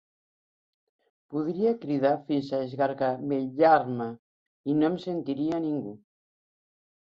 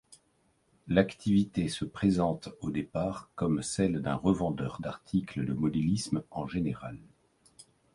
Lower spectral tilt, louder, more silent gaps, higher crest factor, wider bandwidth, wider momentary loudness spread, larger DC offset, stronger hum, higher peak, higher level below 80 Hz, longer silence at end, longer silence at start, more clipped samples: first, -8.5 dB/octave vs -6.5 dB/octave; first, -27 LUFS vs -31 LUFS; first, 4.19-4.64 s vs none; about the same, 20 dB vs 22 dB; second, 7 kHz vs 11.5 kHz; first, 12 LU vs 8 LU; neither; neither; about the same, -10 dBFS vs -10 dBFS; second, -72 dBFS vs -54 dBFS; first, 1.05 s vs 0.3 s; first, 1.3 s vs 0.1 s; neither